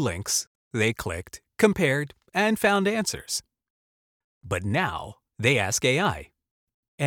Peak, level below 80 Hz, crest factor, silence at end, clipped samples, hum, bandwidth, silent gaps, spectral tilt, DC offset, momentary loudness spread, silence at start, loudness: -6 dBFS; -52 dBFS; 20 dB; 0 s; under 0.1%; none; 19 kHz; 0.47-0.71 s, 3.70-4.41 s, 6.51-6.67 s, 6.74-6.98 s; -4 dB/octave; under 0.1%; 12 LU; 0 s; -25 LUFS